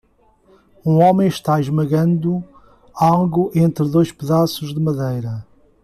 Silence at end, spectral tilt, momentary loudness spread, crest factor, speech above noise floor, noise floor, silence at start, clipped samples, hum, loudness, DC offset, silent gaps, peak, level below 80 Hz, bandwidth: 0.4 s; -8 dB/octave; 10 LU; 16 dB; 39 dB; -55 dBFS; 0.85 s; under 0.1%; none; -17 LUFS; under 0.1%; none; -2 dBFS; -52 dBFS; 14 kHz